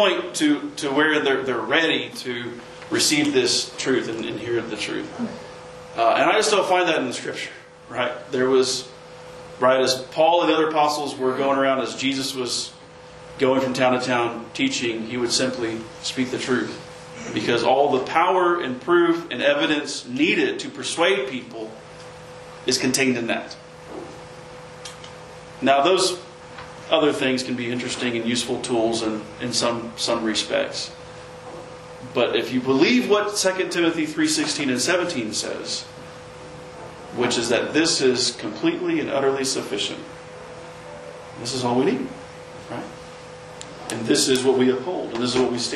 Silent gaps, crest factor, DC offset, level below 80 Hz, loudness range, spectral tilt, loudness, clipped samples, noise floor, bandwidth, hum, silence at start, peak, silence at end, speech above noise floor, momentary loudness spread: none; 20 dB; under 0.1%; -60 dBFS; 5 LU; -3 dB/octave; -21 LUFS; under 0.1%; -43 dBFS; 12.5 kHz; none; 0 s; -2 dBFS; 0 s; 21 dB; 20 LU